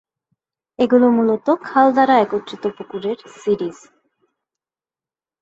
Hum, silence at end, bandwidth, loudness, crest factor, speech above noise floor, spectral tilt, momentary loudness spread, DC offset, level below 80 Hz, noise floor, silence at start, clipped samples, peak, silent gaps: none; 1.7 s; 7.8 kHz; -17 LUFS; 18 dB; over 73 dB; -6.5 dB/octave; 13 LU; under 0.1%; -64 dBFS; under -90 dBFS; 0.8 s; under 0.1%; -2 dBFS; none